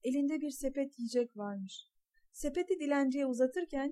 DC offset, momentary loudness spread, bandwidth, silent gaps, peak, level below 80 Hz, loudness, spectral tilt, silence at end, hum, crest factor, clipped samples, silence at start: under 0.1%; 11 LU; 14.5 kHz; none; -20 dBFS; -58 dBFS; -35 LUFS; -4.5 dB/octave; 0 s; none; 16 dB; under 0.1%; 0.05 s